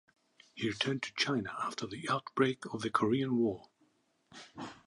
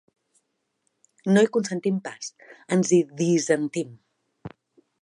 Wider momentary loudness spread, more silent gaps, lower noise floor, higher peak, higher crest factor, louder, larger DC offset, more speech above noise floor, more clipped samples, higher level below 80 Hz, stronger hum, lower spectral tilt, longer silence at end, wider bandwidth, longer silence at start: second, 16 LU vs 23 LU; neither; about the same, -73 dBFS vs -75 dBFS; second, -14 dBFS vs -6 dBFS; about the same, 22 dB vs 20 dB; second, -34 LUFS vs -23 LUFS; neither; second, 39 dB vs 52 dB; neither; about the same, -72 dBFS vs -70 dBFS; neither; about the same, -5 dB/octave vs -5.5 dB/octave; second, 0.1 s vs 0.55 s; about the same, 11.5 kHz vs 11 kHz; second, 0.55 s vs 1.25 s